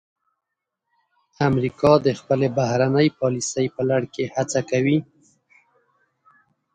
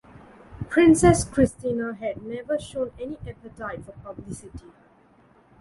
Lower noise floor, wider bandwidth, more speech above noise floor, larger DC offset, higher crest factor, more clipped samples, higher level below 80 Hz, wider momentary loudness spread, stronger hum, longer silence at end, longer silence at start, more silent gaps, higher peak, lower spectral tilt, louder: first, -82 dBFS vs -57 dBFS; second, 9.6 kHz vs 11.5 kHz; first, 62 dB vs 33 dB; neither; about the same, 20 dB vs 22 dB; neither; second, -56 dBFS vs -44 dBFS; second, 7 LU vs 22 LU; neither; first, 1.7 s vs 1 s; first, 1.4 s vs 0.5 s; neither; about the same, -4 dBFS vs -2 dBFS; about the same, -6 dB/octave vs -6 dB/octave; about the same, -21 LUFS vs -23 LUFS